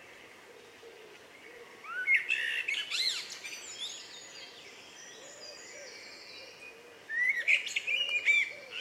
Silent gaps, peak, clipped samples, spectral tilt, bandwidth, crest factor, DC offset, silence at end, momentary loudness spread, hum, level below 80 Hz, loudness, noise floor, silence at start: none; -14 dBFS; under 0.1%; 1.5 dB/octave; 16 kHz; 22 dB; under 0.1%; 0 s; 25 LU; none; -84 dBFS; -30 LUFS; -54 dBFS; 0 s